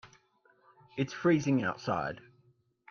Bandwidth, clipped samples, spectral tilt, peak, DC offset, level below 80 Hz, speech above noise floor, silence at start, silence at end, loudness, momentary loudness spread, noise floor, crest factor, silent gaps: 7 kHz; under 0.1%; -6.5 dB/octave; -16 dBFS; under 0.1%; -68 dBFS; 38 dB; 0.05 s; 0.7 s; -31 LUFS; 15 LU; -69 dBFS; 18 dB; none